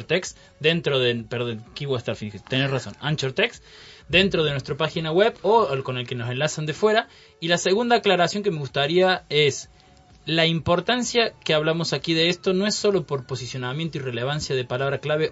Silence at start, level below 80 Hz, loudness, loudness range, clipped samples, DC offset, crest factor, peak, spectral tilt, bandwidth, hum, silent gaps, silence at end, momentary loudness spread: 0 s; -54 dBFS; -23 LUFS; 3 LU; under 0.1%; under 0.1%; 20 dB; -4 dBFS; -4.5 dB/octave; 8 kHz; none; none; 0 s; 9 LU